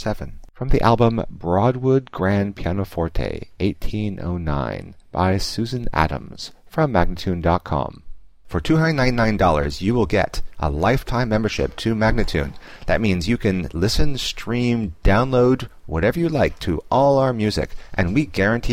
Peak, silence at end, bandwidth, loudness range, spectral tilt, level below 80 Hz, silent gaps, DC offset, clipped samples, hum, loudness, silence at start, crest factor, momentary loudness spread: -2 dBFS; 0 s; 15.5 kHz; 4 LU; -6.5 dB/octave; -30 dBFS; none; 0.7%; under 0.1%; none; -21 LUFS; 0 s; 18 dB; 10 LU